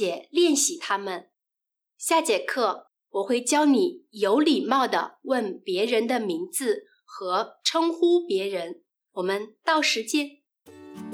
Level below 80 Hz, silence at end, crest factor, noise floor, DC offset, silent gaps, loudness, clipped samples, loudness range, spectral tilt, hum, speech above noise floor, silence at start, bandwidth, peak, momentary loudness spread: -82 dBFS; 0 s; 16 dB; -87 dBFS; under 0.1%; none; -25 LUFS; under 0.1%; 3 LU; -2.5 dB/octave; none; 63 dB; 0 s; 17 kHz; -8 dBFS; 13 LU